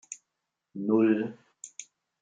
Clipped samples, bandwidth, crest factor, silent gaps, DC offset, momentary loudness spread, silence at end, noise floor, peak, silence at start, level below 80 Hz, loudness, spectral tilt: under 0.1%; 9.4 kHz; 20 dB; none; under 0.1%; 22 LU; 0.4 s; -85 dBFS; -12 dBFS; 0.1 s; -80 dBFS; -27 LUFS; -6 dB/octave